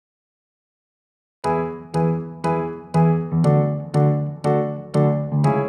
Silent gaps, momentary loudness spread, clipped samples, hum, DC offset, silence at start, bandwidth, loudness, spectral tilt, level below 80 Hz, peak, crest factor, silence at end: none; 6 LU; under 0.1%; none; under 0.1%; 1.45 s; 9.4 kHz; -21 LUFS; -9 dB/octave; -54 dBFS; -6 dBFS; 16 dB; 0 s